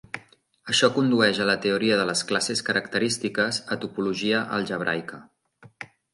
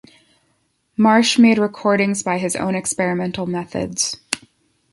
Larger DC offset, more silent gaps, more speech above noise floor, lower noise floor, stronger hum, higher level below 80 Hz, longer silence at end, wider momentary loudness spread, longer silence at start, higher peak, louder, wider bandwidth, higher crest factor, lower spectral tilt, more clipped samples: neither; neither; second, 30 dB vs 48 dB; second, -54 dBFS vs -66 dBFS; neither; second, -66 dBFS vs -56 dBFS; second, 0.3 s vs 0.55 s; first, 18 LU vs 12 LU; second, 0.15 s vs 1 s; second, -4 dBFS vs 0 dBFS; second, -24 LUFS vs -18 LUFS; about the same, 11.5 kHz vs 11.5 kHz; about the same, 20 dB vs 20 dB; about the same, -3.5 dB/octave vs -4 dB/octave; neither